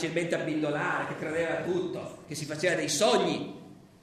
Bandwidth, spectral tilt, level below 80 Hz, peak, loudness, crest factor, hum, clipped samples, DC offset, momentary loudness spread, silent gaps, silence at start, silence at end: 14 kHz; -4 dB/octave; -68 dBFS; -12 dBFS; -29 LUFS; 18 dB; none; under 0.1%; under 0.1%; 14 LU; none; 0 s; 0.15 s